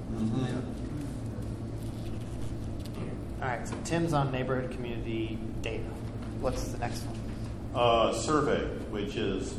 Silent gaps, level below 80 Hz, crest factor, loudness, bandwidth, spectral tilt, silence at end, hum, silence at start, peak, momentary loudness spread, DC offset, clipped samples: none; -42 dBFS; 18 dB; -33 LUFS; 13.5 kHz; -6 dB/octave; 0 s; none; 0 s; -12 dBFS; 11 LU; under 0.1%; under 0.1%